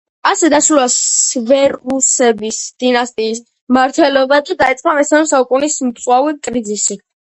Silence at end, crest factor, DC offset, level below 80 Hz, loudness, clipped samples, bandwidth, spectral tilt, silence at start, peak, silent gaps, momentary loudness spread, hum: 0.4 s; 14 dB; under 0.1%; -54 dBFS; -13 LUFS; under 0.1%; 10 kHz; -1.5 dB/octave; 0.25 s; 0 dBFS; 3.61-3.67 s; 8 LU; none